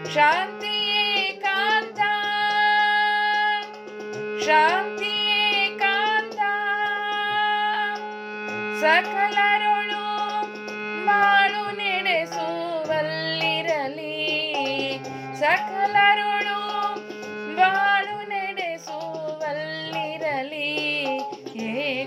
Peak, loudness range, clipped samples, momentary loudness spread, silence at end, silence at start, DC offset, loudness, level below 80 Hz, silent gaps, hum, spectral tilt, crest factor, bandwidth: -6 dBFS; 4 LU; under 0.1%; 12 LU; 0 s; 0 s; under 0.1%; -22 LUFS; -88 dBFS; none; none; -3 dB/octave; 18 dB; 15 kHz